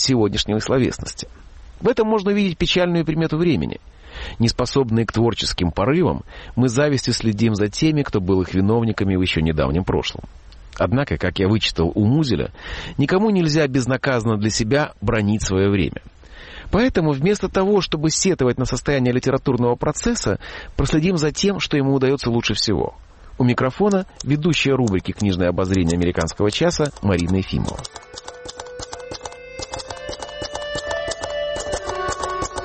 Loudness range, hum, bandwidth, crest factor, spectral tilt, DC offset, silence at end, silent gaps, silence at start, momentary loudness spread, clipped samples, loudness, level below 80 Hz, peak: 5 LU; none; 8.8 kHz; 12 dB; -5.5 dB/octave; under 0.1%; 0 s; none; 0 s; 13 LU; under 0.1%; -20 LUFS; -36 dBFS; -6 dBFS